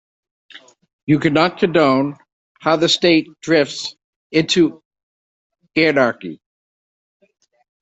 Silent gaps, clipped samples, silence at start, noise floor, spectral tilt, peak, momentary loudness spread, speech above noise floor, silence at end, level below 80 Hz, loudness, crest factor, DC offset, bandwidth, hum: 0.93-1.07 s, 2.32-2.55 s, 4.04-4.30 s, 4.85-4.91 s, 5.03-5.50 s; under 0.1%; 0.55 s; under -90 dBFS; -5 dB/octave; -2 dBFS; 12 LU; over 74 dB; 1.45 s; -58 dBFS; -17 LUFS; 18 dB; under 0.1%; 8.2 kHz; none